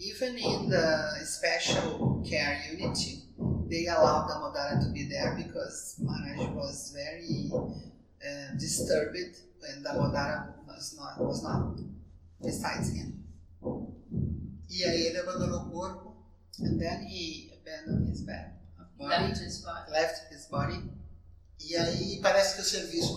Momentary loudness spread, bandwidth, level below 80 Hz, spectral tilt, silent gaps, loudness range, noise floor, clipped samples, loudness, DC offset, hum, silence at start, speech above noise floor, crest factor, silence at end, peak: 15 LU; 16 kHz; -50 dBFS; -4.5 dB/octave; none; 6 LU; -52 dBFS; under 0.1%; -32 LUFS; under 0.1%; none; 0 s; 21 dB; 22 dB; 0 s; -10 dBFS